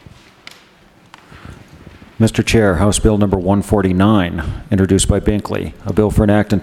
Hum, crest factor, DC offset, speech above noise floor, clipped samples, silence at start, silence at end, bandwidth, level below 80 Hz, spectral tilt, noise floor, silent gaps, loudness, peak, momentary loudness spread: none; 16 dB; under 0.1%; 34 dB; under 0.1%; 1.35 s; 0 s; 15 kHz; -28 dBFS; -6 dB/octave; -47 dBFS; none; -15 LUFS; 0 dBFS; 7 LU